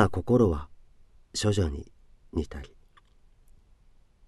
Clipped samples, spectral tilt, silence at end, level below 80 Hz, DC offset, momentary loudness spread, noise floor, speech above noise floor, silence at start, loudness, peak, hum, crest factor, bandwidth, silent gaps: under 0.1%; -6 dB/octave; 1.6 s; -44 dBFS; under 0.1%; 21 LU; -58 dBFS; 32 dB; 0 s; -28 LUFS; -6 dBFS; none; 24 dB; 12 kHz; none